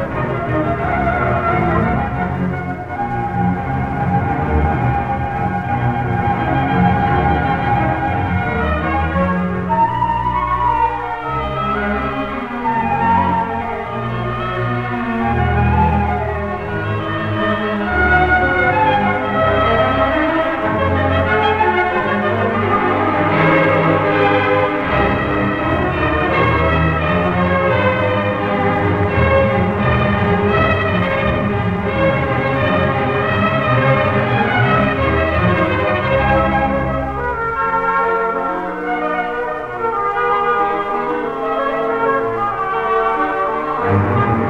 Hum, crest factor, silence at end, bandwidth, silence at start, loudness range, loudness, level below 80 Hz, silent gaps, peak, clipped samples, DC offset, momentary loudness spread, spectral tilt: none; 14 dB; 0 s; 7.8 kHz; 0 s; 4 LU; -16 LUFS; -30 dBFS; none; -2 dBFS; under 0.1%; under 0.1%; 6 LU; -8.5 dB/octave